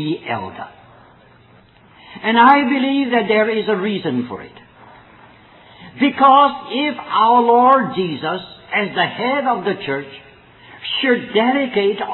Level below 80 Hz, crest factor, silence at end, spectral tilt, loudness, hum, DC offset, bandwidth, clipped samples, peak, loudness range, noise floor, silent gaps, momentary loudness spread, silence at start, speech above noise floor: -60 dBFS; 18 dB; 0 s; -8.5 dB/octave; -16 LUFS; none; under 0.1%; 4.7 kHz; under 0.1%; 0 dBFS; 5 LU; -48 dBFS; none; 14 LU; 0 s; 32 dB